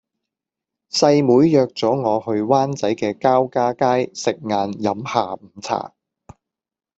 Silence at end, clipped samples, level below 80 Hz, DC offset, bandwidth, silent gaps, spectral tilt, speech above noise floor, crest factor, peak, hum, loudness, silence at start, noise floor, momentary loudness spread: 1.1 s; under 0.1%; -60 dBFS; under 0.1%; 8.2 kHz; none; -5.5 dB/octave; 70 dB; 18 dB; -2 dBFS; none; -19 LUFS; 0.95 s; -88 dBFS; 11 LU